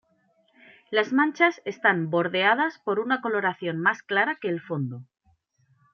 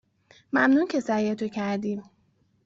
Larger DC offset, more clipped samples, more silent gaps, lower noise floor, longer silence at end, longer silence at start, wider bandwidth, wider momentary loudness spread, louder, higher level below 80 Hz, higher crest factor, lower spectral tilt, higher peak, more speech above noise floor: neither; neither; neither; about the same, -67 dBFS vs -67 dBFS; first, 0.9 s vs 0.65 s; first, 0.9 s vs 0.55 s; second, 6.8 kHz vs 7.8 kHz; about the same, 8 LU vs 10 LU; about the same, -24 LUFS vs -25 LUFS; second, -80 dBFS vs -68 dBFS; about the same, 20 dB vs 16 dB; about the same, -6 dB/octave vs -6 dB/octave; first, -6 dBFS vs -10 dBFS; about the same, 42 dB vs 42 dB